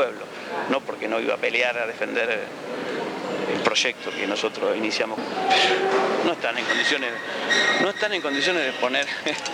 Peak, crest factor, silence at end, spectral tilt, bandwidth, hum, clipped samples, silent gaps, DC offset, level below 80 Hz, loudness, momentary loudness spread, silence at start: -2 dBFS; 22 dB; 0 s; -2.5 dB/octave; 16 kHz; none; under 0.1%; none; under 0.1%; -74 dBFS; -23 LUFS; 9 LU; 0 s